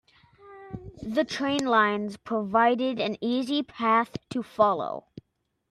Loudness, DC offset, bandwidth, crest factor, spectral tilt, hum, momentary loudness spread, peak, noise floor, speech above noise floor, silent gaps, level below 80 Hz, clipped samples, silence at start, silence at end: -26 LUFS; under 0.1%; 12.5 kHz; 18 dB; -5 dB/octave; none; 14 LU; -8 dBFS; -77 dBFS; 51 dB; none; -62 dBFS; under 0.1%; 0.45 s; 0.7 s